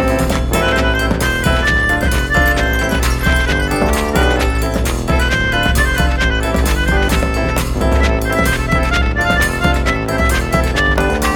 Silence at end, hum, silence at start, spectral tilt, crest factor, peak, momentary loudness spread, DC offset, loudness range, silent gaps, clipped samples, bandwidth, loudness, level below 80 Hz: 0 s; none; 0 s; -5 dB/octave; 14 dB; 0 dBFS; 3 LU; under 0.1%; 1 LU; none; under 0.1%; 18 kHz; -15 LUFS; -18 dBFS